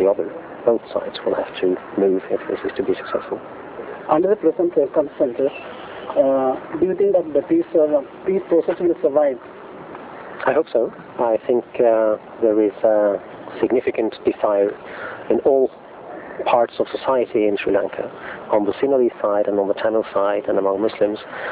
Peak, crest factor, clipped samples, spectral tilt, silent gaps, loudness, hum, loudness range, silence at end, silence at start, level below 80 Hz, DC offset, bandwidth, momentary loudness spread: -2 dBFS; 18 dB; under 0.1%; -10 dB/octave; none; -20 LUFS; none; 2 LU; 0 s; 0 s; -58 dBFS; under 0.1%; 4 kHz; 14 LU